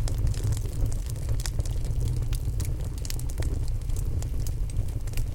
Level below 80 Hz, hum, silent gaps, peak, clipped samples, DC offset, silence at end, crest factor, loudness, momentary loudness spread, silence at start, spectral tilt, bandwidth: -30 dBFS; none; none; -10 dBFS; under 0.1%; under 0.1%; 0 s; 18 dB; -31 LUFS; 4 LU; 0 s; -5.5 dB/octave; 17 kHz